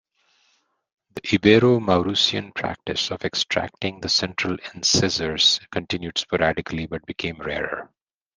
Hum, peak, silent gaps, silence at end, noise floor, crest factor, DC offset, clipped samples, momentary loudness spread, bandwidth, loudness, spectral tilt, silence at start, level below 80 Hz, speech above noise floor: none; -2 dBFS; none; 0.5 s; -67 dBFS; 22 dB; under 0.1%; under 0.1%; 13 LU; 10 kHz; -21 LUFS; -3.5 dB/octave; 1.15 s; -52 dBFS; 45 dB